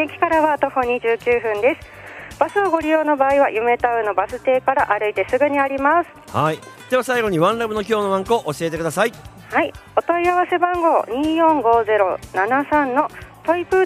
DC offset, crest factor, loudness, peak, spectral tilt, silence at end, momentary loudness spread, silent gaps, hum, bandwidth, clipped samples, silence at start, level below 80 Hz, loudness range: under 0.1%; 16 dB; -19 LUFS; -2 dBFS; -5.5 dB/octave; 0 s; 6 LU; none; none; 15.5 kHz; under 0.1%; 0 s; -48 dBFS; 2 LU